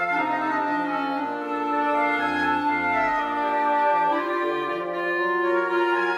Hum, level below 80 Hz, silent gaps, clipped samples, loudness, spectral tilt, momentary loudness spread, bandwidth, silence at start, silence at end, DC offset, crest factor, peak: none; -62 dBFS; none; under 0.1%; -23 LUFS; -5.5 dB/octave; 5 LU; 12 kHz; 0 s; 0 s; under 0.1%; 12 dB; -12 dBFS